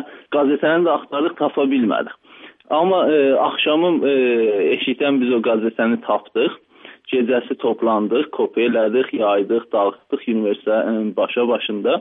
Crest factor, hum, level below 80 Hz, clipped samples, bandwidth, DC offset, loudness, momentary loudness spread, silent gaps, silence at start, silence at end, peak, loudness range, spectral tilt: 14 dB; none; -74 dBFS; under 0.1%; 3.9 kHz; under 0.1%; -18 LUFS; 6 LU; none; 0 s; 0 s; -4 dBFS; 3 LU; -9 dB/octave